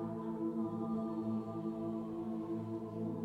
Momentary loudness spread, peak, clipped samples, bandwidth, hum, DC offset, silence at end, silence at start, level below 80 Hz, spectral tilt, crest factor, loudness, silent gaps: 3 LU; -28 dBFS; under 0.1%; 4.8 kHz; none; under 0.1%; 0 s; 0 s; -70 dBFS; -10 dB/octave; 12 dB; -40 LUFS; none